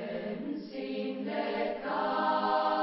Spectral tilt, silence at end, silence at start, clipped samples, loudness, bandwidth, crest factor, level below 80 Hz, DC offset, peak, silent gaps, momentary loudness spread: -3 dB/octave; 0 s; 0 s; under 0.1%; -32 LUFS; 5.8 kHz; 16 dB; -72 dBFS; under 0.1%; -16 dBFS; none; 9 LU